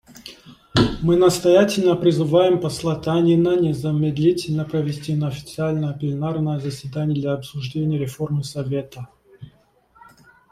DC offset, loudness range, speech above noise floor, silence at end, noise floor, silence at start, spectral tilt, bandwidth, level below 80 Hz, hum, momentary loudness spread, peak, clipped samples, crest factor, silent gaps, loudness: under 0.1%; 9 LU; 37 dB; 1.05 s; -57 dBFS; 0.1 s; -6.5 dB/octave; 15 kHz; -48 dBFS; none; 11 LU; -2 dBFS; under 0.1%; 18 dB; none; -20 LUFS